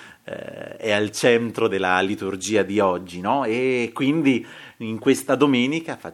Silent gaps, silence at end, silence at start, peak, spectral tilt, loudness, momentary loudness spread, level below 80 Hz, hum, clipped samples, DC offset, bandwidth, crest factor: none; 0 s; 0 s; -2 dBFS; -4.5 dB/octave; -21 LUFS; 15 LU; -66 dBFS; none; under 0.1%; under 0.1%; 14.5 kHz; 20 dB